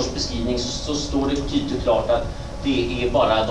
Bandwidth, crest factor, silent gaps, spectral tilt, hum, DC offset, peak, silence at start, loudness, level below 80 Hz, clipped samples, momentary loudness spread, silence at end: 11 kHz; 16 dB; none; -5 dB/octave; none; 0.9%; -6 dBFS; 0 s; -22 LUFS; -32 dBFS; under 0.1%; 5 LU; 0 s